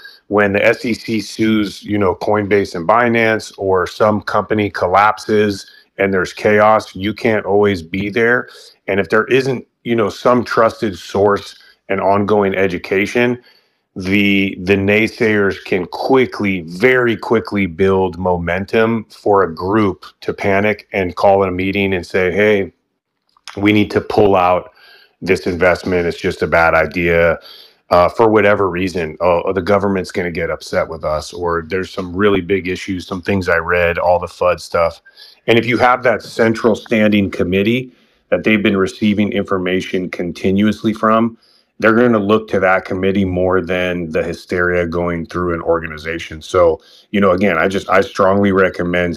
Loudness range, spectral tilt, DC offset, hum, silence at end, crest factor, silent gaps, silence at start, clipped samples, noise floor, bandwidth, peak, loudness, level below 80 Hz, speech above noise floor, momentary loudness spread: 2 LU; -6.5 dB/octave; under 0.1%; none; 0 s; 16 dB; none; 0.05 s; under 0.1%; -70 dBFS; 15 kHz; 0 dBFS; -15 LUFS; -44 dBFS; 55 dB; 8 LU